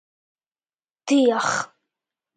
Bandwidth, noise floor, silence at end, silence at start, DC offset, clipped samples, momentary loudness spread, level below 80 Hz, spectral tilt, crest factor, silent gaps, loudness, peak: 9.4 kHz; under -90 dBFS; 0.7 s; 1.05 s; under 0.1%; under 0.1%; 17 LU; -76 dBFS; -3.5 dB/octave; 18 dB; none; -21 LUFS; -8 dBFS